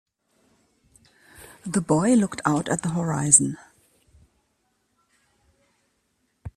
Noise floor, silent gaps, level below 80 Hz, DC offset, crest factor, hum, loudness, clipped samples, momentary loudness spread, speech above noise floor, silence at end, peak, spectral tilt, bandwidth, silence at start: -71 dBFS; none; -58 dBFS; under 0.1%; 26 dB; none; -21 LUFS; under 0.1%; 20 LU; 50 dB; 0.05 s; 0 dBFS; -4.5 dB/octave; 14 kHz; 1.4 s